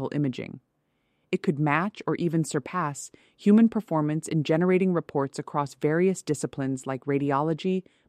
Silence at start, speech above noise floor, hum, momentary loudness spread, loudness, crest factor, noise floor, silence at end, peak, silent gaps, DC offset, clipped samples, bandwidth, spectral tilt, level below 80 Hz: 0 s; 47 dB; none; 9 LU; -26 LUFS; 18 dB; -73 dBFS; 0.3 s; -8 dBFS; none; under 0.1%; under 0.1%; 14 kHz; -6.5 dB/octave; -68 dBFS